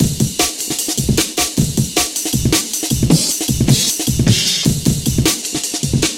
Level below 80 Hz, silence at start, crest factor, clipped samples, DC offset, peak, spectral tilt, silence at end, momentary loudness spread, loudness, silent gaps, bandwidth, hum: -30 dBFS; 0 s; 16 dB; under 0.1%; under 0.1%; 0 dBFS; -3.5 dB/octave; 0 s; 4 LU; -15 LUFS; none; 17 kHz; none